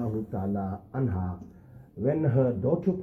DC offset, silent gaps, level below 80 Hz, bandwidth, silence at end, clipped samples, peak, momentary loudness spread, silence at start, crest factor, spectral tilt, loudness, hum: under 0.1%; none; -58 dBFS; 3.4 kHz; 0 s; under 0.1%; -12 dBFS; 14 LU; 0 s; 16 dB; -12 dB/octave; -29 LUFS; none